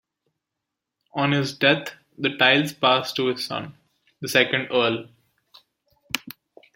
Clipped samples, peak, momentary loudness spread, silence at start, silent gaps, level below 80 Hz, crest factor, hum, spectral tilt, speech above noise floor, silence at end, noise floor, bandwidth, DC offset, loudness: under 0.1%; -2 dBFS; 15 LU; 1.15 s; none; -68 dBFS; 24 dB; none; -4 dB/octave; 62 dB; 0.45 s; -84 dBFS; 16.5 kHz; under 0.1%; -22 LUFS